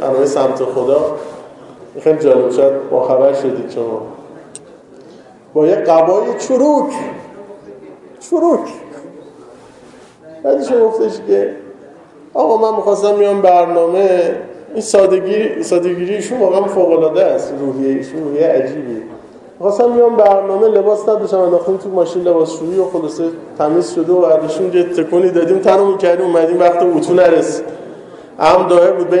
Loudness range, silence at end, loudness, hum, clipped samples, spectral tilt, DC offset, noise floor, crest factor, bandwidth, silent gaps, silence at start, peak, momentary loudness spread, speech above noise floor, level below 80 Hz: 5 LU; 0 s; -13 LUFS; none; under 0.1%; -6 dB/octave; under 0.1%; -40 dBFS; 14 dB; 11 kHz; none; 0 s; 0 dBFS; 14 LU; 28 dB; -58 dBFS